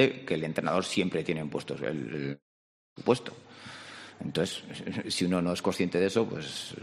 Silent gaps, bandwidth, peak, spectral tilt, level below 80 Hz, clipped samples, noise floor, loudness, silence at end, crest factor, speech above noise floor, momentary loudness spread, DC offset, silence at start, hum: 2.42-2.96 s; 13 kHz; -8 dBFS; -5 dB/octave; -66 dBFS; under 0.1%; under -90 dBFS; -31 LUFS; 0 s; 22 dB; over 60 dB; 16 LU; under 0.1%; 0 s; none